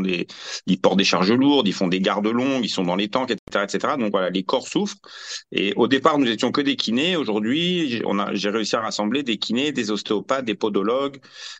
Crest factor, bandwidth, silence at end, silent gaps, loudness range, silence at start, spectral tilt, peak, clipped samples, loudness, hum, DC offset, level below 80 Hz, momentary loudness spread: 18 dB; 8.6 kHz; 0 s; 3.39-3.47 s; 3 LU; 0 s; -4.5 dB/octave; -2 dBFS; under 0.1%; -21 LUFS; none; under 0.1%; -64 dBFS; 8 LU